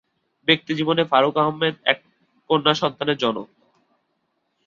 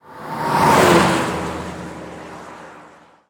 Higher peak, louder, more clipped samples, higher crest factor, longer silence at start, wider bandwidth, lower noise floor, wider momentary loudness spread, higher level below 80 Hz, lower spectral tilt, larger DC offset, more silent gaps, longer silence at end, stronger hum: about the same, -2 dBFS vs -2 dBFS; second, -20 LUFS vs -16 LUFS; neither; about the same, 22 dB vs 18 dB; first, 0.45 s vs 0.1 s; second, 7.4 kHz vs 19.5 kHz; first, -72 dBFS vs -46 dBFS; second, 7 LU vs 23 LU; second, -66 dBFS vs -46 dBFS; about the same, -5.5 dB/octave vs -4.5 dB/octave; neither; neither; first, 1.2 s vs 0.5 s; neither